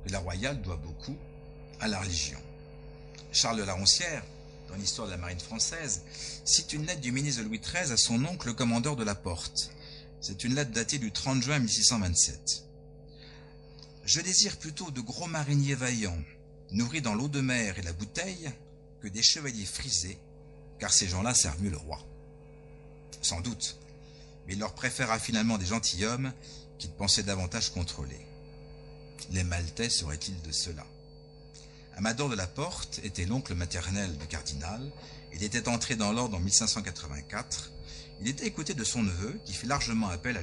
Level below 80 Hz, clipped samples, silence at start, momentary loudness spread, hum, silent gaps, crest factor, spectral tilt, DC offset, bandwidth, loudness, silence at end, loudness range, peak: -48 dBFS; under 0.1%; 0 s; 22 LU; none; none; 24 dB; -3 dB/octave; under 0.1%; 11 kHz; -30 LUFS; 0 s; 6 LU; -8 dBFS